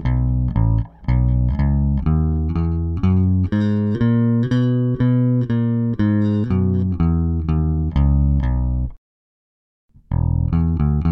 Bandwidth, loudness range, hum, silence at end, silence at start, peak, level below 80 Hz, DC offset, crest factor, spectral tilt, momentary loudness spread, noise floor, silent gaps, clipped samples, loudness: 5.6 kHz; 3 LU; none; 0 s; 0 s; -6 dBFS; -24 dBFS; under 0.1%; 12 dB; -11 dB/octave; 4 LU; under -90 dBFS; 8.98-9.89 s; under 0.1%; -19 LUFS